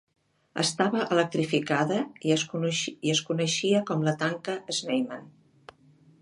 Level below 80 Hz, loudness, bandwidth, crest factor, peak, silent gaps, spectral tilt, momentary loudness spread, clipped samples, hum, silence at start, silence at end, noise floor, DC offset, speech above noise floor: -74 dBFS; -27 LUFS; 11.5 kHz; 20 dB; -8 dBFS; none; -4 dB/octave; 6 LU; under 0.1%; none; 0.55 s; 0.9 s; -58 dBFS; under 0.1%; 31 dB